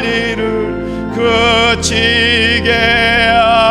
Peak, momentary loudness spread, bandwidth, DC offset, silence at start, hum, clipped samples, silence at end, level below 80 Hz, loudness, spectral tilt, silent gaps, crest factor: 0 dBFS; 8 LU; 14 kHz; under 0.1%; 0 s; none; under 0.1%; 0 s; -30 dBFS; -11 LUFS; -3.5 dB/octave; none; 12 dB